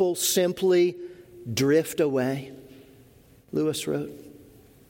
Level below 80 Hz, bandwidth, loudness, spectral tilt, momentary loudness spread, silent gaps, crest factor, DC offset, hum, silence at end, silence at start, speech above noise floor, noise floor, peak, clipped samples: -64 dBFS; 17 kHz; -25 LUFS; -4.5 dB/octave; 20 LU; none; 16 dB; under 0.1%; none; 0.45 s; 0 s; 31 dB; -55 dBFS; -10 dBFS; under 0.1%